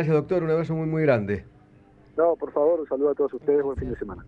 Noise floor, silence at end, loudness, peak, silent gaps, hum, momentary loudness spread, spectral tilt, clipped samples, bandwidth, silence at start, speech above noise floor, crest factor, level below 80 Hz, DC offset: -53 dBFS; 0 s; -24 LUFS; -8 dBFS; none; none; 9 LU; -10 dB/octave; under 0.1%; 5.8 kHz; 0 s; 30 dB; 16 dB; -48 dBFS; under 0.1%